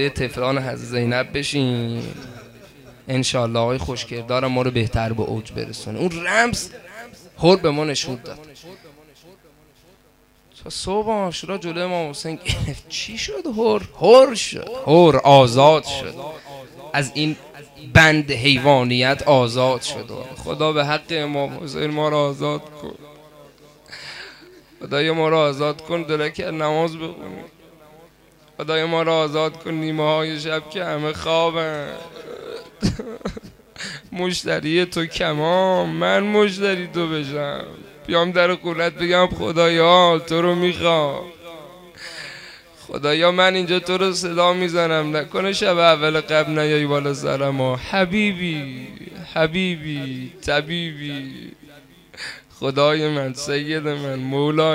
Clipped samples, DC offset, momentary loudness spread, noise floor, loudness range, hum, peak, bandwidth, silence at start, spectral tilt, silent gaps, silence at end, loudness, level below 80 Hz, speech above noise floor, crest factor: under 0.1%; under 0.1%; 19 LU; -55 dBFS; 9 LU; none; 0 dBFS; 16 kHz; 0 s; -5 dB/octave; none; 0 s; -19 LUFS; -46 dBFS; 36 dB; 20 dB